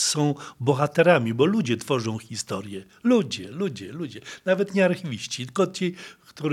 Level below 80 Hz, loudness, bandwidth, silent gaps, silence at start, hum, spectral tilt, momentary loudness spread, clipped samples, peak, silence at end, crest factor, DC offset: -72 dBFS; -24 LUFS; 15.5 kHz; none; 0 s; none; -5 dB/octave; 14 LU; under 0.1%; -4 dBFS; 0 s; 22 dB; under 0.1%